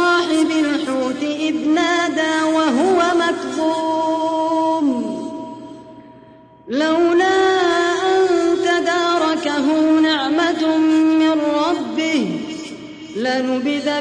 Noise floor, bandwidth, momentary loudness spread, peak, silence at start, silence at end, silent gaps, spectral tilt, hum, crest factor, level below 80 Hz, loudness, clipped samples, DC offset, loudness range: -44 dBFS; 10.5 kHz; 10 LU; -4 dBFS; 0 s; 0 s; none; -3.5 dB/octave; none; 12 dB; -60 dBFS; -17 LUFS; under 0.1%; under 0.1%; 4 LU